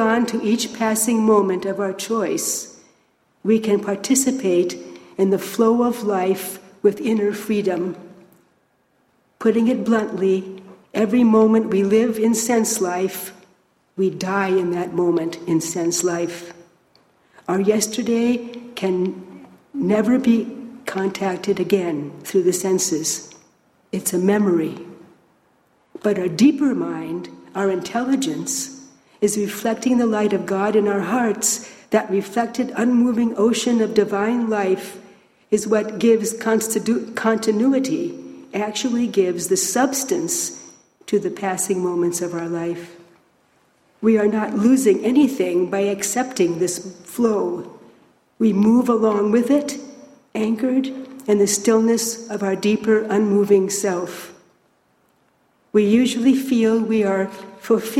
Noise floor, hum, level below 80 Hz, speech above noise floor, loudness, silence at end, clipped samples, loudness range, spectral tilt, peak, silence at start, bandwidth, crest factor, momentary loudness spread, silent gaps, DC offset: -63 dBFS; none; -64 dBFS; 44 dB; -20 LUFS; 0 s; under 0.1%; 4 LU; -4.5 dB/octave; -2 dBFS; 0 s; 16 kHz; 16 dB; 12 LU; none; under 0.1%